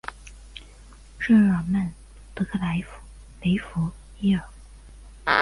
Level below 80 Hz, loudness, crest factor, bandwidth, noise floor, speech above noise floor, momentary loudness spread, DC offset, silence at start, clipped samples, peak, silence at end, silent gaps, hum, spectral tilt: -44 dBFS; -25 LUFS; 20 dB; 11.5 kHz; -47 dBFS; 24 dB; 25 LU; under 0.1%; 0.05 s; under 0.1%; -4 dBFS; 0 s; none; none; -7 dB/octave